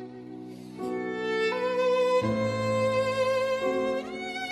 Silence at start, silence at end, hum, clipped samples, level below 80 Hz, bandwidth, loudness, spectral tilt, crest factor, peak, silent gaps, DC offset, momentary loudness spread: 0 s; 0 s; none; under 0.1%; -62 dBFS; 13 kHz; -27 LUFS; -5.5 dB/octave; 12 dB; -14 dBFS; none; under 0.1%; 17 LU